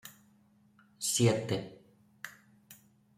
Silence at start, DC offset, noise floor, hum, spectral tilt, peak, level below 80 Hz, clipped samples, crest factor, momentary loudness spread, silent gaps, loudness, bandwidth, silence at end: 0.05 s; under 0.1%; -66 dBFS; none; -4.5 dB/octave; -14 dBFS; -72 dBFS; under 0.1%; 22 dB; 22 LU; none; -31 LUFS; 16 kHz; 0.45 s